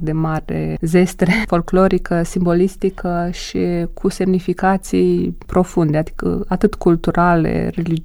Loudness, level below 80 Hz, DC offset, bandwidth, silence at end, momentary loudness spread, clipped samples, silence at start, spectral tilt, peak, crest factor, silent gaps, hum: -17 LUFS; -32 dBFS; under 0.1%; 13.5 kHz; 0 s; 7 LU; under 0.1%; 0 s; -7 dB/octave; 0 dBFS; 16 dB; none; none